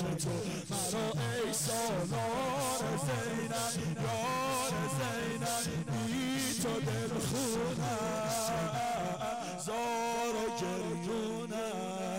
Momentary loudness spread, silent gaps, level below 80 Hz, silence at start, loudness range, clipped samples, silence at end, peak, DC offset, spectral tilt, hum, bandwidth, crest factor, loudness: 4 LU; none; -60 dBFS; 0 s; 1 LU; under 0.1%; 0 s; -28 dBFS; under 0.1%; -4 dB/octave; none; 16 kHz; 8 dB; -34 LUFS